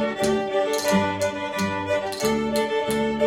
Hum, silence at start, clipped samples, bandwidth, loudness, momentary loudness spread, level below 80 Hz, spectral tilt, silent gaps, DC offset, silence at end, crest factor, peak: none; 0 s; under 0.1%; 16.5 kHz; -23 LUFS; 4 LU; -52 dBFS; -4.5 dB/octave; none; under 0.1%; 0 s; 16 dB; -8 dBFS